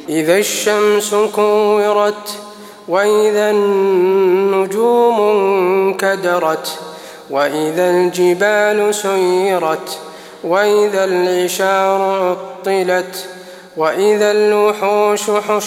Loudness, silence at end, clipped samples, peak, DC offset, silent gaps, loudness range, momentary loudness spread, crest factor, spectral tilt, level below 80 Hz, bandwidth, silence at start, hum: -14 LUFS; 0 s; under 0.1%; 0 dBFS; under 0.1%; none; 2 LU; 13 LU; 14 dB; -4 dB/octave; -68 dBFS; 16.5 kHz; 0 s; none